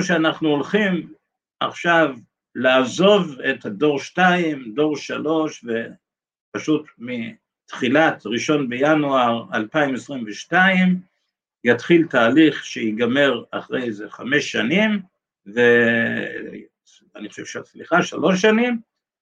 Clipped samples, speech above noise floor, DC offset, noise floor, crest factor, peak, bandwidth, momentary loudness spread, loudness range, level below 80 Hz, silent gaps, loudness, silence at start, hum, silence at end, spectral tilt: under 0.1%; 57 dB; under 0.1%; -76 dBFS; 18 dB; -2 dBFS; 9 kHz; 15 LU; 4 LU; -70 dBFS; 6.40-6.52 s; -19 LUFS; 0 s; none; 0.4 s; -5.5 dB/octave